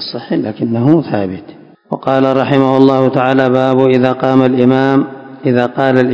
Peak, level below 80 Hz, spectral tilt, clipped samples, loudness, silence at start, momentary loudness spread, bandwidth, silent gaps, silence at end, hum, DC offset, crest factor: 0 dBFS; -52 dBFS; -8.5 dB/octave; 1%; -12 LUFS; 0 s; 10 LU; 7.2 kHz; none; 0 s; none; under 0.1%; 12 dB